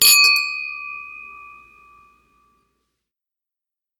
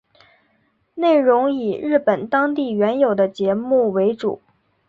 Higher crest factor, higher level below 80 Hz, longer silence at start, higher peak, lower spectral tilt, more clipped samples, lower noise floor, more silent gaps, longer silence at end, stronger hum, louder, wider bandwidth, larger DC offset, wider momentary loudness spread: first, 22 dB vs 16 dB; about the same, -68 dBFS vs -64 dBFS; second, 0 s vs 0.95 s; first, 0 dBFS vs -4 dBFS; second, 4 dB/octave vs -8 dB/octave; neither; first, -87 dBFS vs -64 dBFS; neither; first, 2.55 s vs 0.5 s; neither; first, -15 LUFS vs -18 LUFS; first, 19 kHz vs 7.4 kHz; neither; first, 27 LU vs 8 LU